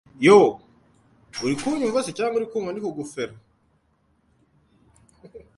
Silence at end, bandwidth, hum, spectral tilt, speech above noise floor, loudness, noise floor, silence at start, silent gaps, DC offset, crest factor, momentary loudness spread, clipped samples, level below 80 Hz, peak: 0.2 s; 11.5 kHz; none; -5 dB/octave; 45 dB; -22 LUFS; -66 dBFS; 0.2 s; none; under 0.1%; 22 dB; 18 LU; under 0.1%; -62 dBFS; -2 dBFS